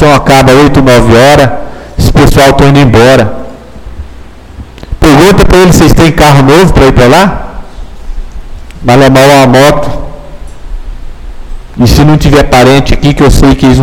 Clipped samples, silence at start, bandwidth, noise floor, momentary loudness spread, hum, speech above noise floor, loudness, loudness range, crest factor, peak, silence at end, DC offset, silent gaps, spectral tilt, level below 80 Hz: 10%; 0 s; 19 kHz; -27 dBFS; 21 LU; none; 25 dB; -3 LUFS; 3 LU; 4 dB; 0 dBFS; 0 s; under 0.1%; none; -6 dB/octave; -14 dBFS